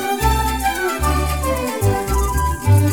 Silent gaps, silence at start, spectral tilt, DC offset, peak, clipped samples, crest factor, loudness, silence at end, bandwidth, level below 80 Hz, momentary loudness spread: none; 0 s; -5 dB/octave; 0.4%; -4 dBFS; under 0.1%; 14 dB; -19 LUFS; 0 s; 19.5 kHz; -24 dBFS; 4 LU